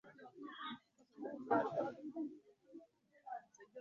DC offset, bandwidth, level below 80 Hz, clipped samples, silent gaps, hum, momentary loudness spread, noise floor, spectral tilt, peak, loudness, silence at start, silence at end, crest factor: under 0.1%; 7.2 kHz; -90 dBFS; under 0.1%; none; none; 23 LU; -65 dBFS; -4 dB/octave; -22 dBFS; -44 LUFS; 0.05 s; 0 s; 24 dB